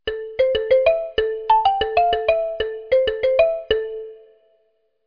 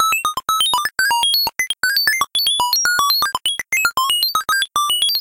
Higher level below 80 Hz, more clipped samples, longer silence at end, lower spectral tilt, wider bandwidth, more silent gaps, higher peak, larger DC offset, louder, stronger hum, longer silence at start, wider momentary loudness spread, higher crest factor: first, -44 dBFS vs -54 dBFS; neither; first, 0.9 s vs 0 s; first, -5 dB/octave vs 2 dB/octave; second, 5.2 kHz vs 17.5 kHz; neither; about the same, -4 dBFS vs -6 dBFS; neither; second, -19 LUFS vs -16 LUFS; neither; about the same, 0.05 s vs 0 s; first, 10 LU vs 4 LU; about the same, 16 dB vs 12 dB